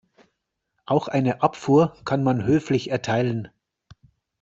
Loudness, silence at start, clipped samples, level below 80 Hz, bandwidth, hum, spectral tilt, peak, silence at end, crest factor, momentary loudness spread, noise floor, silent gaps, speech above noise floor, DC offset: -22 LUFS; 0.9 s; under 0.1%; -58 dBFS; 7.8 kHz; none; -7.5 dB/octave; -4 dBFS; 0.95 s; 20 dB; 6 LU; -77 dBFS; none; 56 dB; under 0.1%